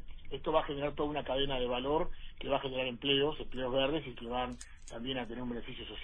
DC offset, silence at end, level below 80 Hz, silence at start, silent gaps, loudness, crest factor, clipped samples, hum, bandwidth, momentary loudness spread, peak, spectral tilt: under 0.1%; 0 s; -46 dBFS; 0 s; none; -35 LUFS; 20 dB; under 0.1%; none; 9.8 kHz; 12 LU; -16 dBFS; -5.5 dB/octave